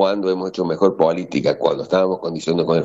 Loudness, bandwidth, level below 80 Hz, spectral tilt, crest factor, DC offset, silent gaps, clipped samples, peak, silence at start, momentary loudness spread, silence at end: -19 LUFS; 8 kHz; -58 dBFS; -6.5 dB/octave; 16 dB; under 0.1%; none; under 0.1%; -2 dBFS; 0 s; 5 LU; 0 s